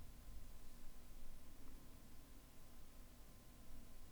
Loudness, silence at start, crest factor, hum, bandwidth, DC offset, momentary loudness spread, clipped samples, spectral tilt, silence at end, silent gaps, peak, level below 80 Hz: -63 LUFS; 0 s; 12 dB; none; over 20 kHz; under 0.1%; 3 LU; under 0.1%; -4.5 dB/octave; 0 s; none; -40 dBFS; -58 dBFS